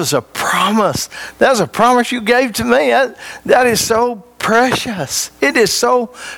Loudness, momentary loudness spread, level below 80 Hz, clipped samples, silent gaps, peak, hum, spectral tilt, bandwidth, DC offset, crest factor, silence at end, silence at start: -14 LUFS; 7 LU; -48 dBFS; under 0.1%; none; 0 dBFS; none; -3 dB/octave; 19 kHz; under 0.1%; 14 dB; 0 s; 0 s